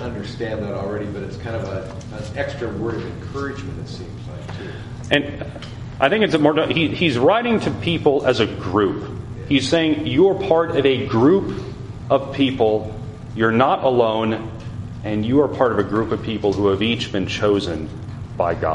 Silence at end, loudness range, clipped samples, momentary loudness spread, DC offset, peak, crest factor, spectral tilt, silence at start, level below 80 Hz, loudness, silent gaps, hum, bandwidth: 0 s; 9 LU; under 0.1%; 15 LU; under 0.1%; 0 dBFS; 20 dB; -6.5 dB/octave; 0 s; -42 dBFS; -20 LUFS; none; none; 11 kHz